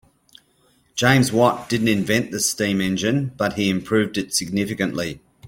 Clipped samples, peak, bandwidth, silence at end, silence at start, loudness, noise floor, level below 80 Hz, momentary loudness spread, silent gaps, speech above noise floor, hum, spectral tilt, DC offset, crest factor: under 0.1%; -2 dBFS; 16.5 kHz; 0 s; 0.95 s; -20 LUFS; -60 dBFS; -54 dBFS; 7 LU; none; 40 dB; none; -4.5 dB/octave; under 0.1%; 20 dB